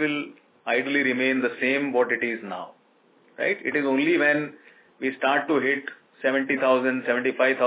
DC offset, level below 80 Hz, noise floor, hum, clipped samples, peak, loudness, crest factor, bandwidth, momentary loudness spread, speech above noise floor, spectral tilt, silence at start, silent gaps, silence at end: under 0.1%; -84 dBFS; -60 dBFS; none; under 0.1%; -8 dBFS; -24 LUFS; 16 dB; 4 kHz; 13 LU; 36 dB; -8 dB/octave; 0 s; none; 0 s